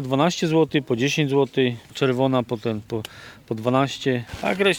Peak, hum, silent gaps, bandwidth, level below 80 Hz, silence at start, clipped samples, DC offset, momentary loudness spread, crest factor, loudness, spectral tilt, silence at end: -4 dBFS; none; none; 18 kHz; -56 dBFS; 0 s; under 0.1%; under 0.1%; 10 LU; 18 dB; -22 LUFS; -5.5 dB/octave; 0 s